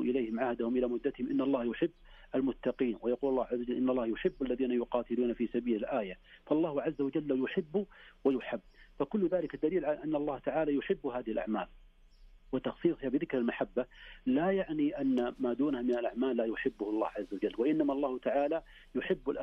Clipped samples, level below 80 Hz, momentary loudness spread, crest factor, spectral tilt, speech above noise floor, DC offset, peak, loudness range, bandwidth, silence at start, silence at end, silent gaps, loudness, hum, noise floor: under 0.1%; -60 dBFS; 6 LU; 16 dB; -8.5 dB/octave; 25 dB; under 0.1%; -18 dBFS; 2 LU; 5.8 kHz; 0 s; 0 s; none; -33 LUFS; none; -58 dBFS